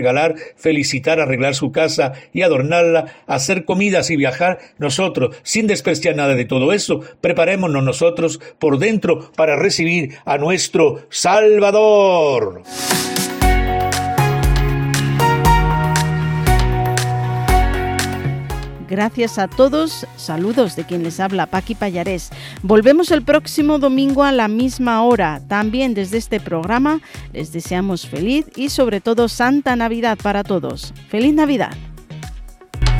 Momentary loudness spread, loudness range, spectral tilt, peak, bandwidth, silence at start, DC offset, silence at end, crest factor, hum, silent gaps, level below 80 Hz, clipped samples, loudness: 9 LU; 5 LU; -5 dB/octave; 0 dBFS; 18 kHz; 0 s; under 0.1%; 0 s; 16 dB; none; none; -28 dBFS; under 0.1%; -16 LUFS